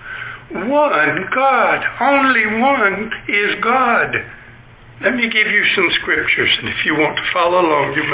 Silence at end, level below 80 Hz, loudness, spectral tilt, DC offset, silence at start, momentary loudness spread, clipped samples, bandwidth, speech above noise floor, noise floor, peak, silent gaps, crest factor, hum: 0 s; -50 dBFS; -14 LUFS; -7.5 dB/octave; under 0.1%; 0 s; 8 LU; under 0.1%; 4 kHz; 25 dB; -41 dBFS; -2 dBFS; none; 14 dB; none